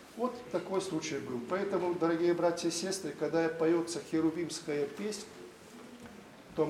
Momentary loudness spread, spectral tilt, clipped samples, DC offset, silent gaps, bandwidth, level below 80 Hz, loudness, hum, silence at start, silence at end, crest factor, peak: 20 LU; -4.5 dB/octave; under 0.1%; under 0.1%; none; 14.5 kHz; -72 dBFS; -33 LUFS; none; 0 s; 0 s; 18 dB; -16 dBFS